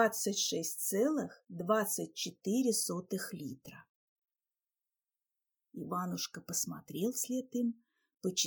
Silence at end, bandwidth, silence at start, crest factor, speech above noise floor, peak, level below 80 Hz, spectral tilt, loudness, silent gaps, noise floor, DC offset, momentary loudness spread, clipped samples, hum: 0 s; 19 kHz; 0 s; 20 dB; over 55 dB; -16 dBFS; -82 dBFS; -3 dB/octave; -35 LUFS; 3.89-4.22 s; under -90 dBFS; under 0.1%; 13 LU; under 0.1%; none